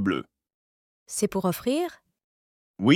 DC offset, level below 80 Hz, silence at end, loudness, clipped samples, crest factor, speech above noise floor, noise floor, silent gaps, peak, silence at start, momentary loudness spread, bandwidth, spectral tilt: under 0.1%; -64 dBFS; 0 s; -28 LUFS; under 0.1%; 22 dB; over 63 dB; under -90 dBFS; 0.54-1.06 s, 2.24-2.74 s; -6 dBFS; 0 s; 7 LU; 17 kHz; -5 dB/octave